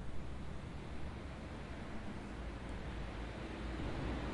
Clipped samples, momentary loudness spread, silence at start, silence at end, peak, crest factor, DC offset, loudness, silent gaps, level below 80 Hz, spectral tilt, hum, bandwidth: under 0.1%; 6 LU; 0 s; 0 s; -30 dBFS; 14 dB; under 0.1%; -46 LUFS; none; -48 dBFS; -6.5 dB/octave; none; 11.5 kHz